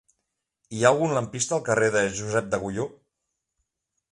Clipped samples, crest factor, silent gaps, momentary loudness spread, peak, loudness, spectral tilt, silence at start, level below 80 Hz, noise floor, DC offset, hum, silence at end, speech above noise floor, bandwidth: under 0.1%; 22 dB; none; 11 LU; -4 dBFS; -24 LUFS; -4.5 dB/octave; 0.7 s; -58 dBFS; -81 dBFS; under 0.1%; none; 1.25 s; 57 dB; 11.5 kHz